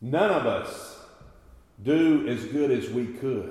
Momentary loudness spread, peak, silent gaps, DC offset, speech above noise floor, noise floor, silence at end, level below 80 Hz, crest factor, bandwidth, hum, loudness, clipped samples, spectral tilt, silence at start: 14 LU; -10 dBFS; none; under 0.1%; 28 dB; -53 dBFS; 0 s; -58 dBFS; 16 dB; 13.5 kHz; none; -25 LUFS; under 0.1%; -6.5 dB/octave; 0 s